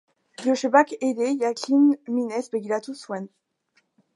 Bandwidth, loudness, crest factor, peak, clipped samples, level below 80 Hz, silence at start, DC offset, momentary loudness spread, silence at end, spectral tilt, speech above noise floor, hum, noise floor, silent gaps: 11.5 kHz; -23 LUFS; 22 dB; -4 dBFS; under 0.1%; -82 dBFS; 0.4 s; under 0.1%; 14 LU; 0.9 s; -4.5 dB/octave; 46 dB; none; -68 dBFS; none